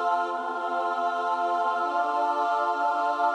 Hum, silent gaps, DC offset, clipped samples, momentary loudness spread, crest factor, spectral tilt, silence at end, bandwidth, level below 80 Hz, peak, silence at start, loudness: none; none; under 0.1%; under 0.1%; 3 LU; 12 dB; -2 dB/octave; 0 s; 10 kHz; -78 dBFS; -14 dBFS; 0 s; -26 LUFS